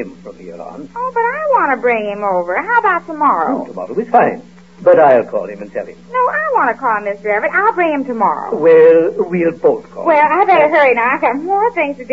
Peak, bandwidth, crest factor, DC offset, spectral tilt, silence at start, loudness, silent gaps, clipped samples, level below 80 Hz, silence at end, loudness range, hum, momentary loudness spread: 0 dBFS; 7.4 kHz; 14 dB; 0.4%; -7 dB/octave; 0 s; -13 LUFS; none; under 0.1%; -56 dBFS; 0 s; 4 LU; none; 15 LU